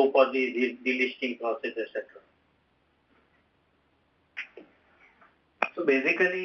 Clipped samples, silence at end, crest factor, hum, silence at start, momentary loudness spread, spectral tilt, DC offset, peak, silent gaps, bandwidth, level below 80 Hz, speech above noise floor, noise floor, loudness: under 0.1%; 0 s; 24 dB; none; 0 s; 17 LU; -1.5 dB/octave; under 0.1%; -6 dBFS; none; 6.6 kHz; -78 dBFS; 42 dB; -69 dBFS; -27 LUFS